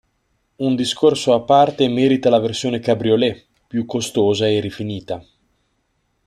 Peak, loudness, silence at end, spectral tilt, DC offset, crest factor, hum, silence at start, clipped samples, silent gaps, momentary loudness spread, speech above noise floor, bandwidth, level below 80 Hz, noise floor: -2 dBFS; -18 LUFS; 1.05 s; -5.5 dB/octave; under 0.1%; 16 dB; none; 0.6 s; under 0.1%; none; 13 LU; 50 dB; 13 kHz; -58 dBFS; -67 dBFS